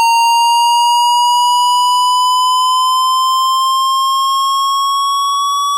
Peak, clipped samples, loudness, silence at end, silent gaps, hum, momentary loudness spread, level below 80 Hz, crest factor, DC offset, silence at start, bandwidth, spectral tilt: -8 dBFS; under 0.1%; -11 LUFS; 0 s; none; none; 3 LU; under -90 dBFS; 2 dB; under 0.1%; 0 s; 16 kHz; 11.5 dB/octave